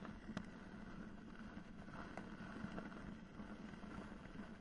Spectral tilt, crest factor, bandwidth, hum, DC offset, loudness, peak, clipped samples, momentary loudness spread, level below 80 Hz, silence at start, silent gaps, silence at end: -6.5 dB/octave; 22 dB; 10.5 kHz; none; under 0.1%; -54 LUFS; -30 dBFS; under 0.1%; 5 LU; -62 dBFS; 0 s; none; 0 s